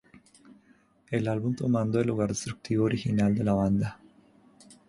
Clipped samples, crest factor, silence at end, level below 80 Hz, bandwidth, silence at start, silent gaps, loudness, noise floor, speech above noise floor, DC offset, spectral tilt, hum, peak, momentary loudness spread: under 0.1%; 16 dB; 0.15 s; -54 dBFS; 11.5 kHz; 1.1 s; none; -28 LUFS; -62 dBFS; 36 dB; under 0.1%; -7 dB/octave; none; -12 dBFS; 6 LU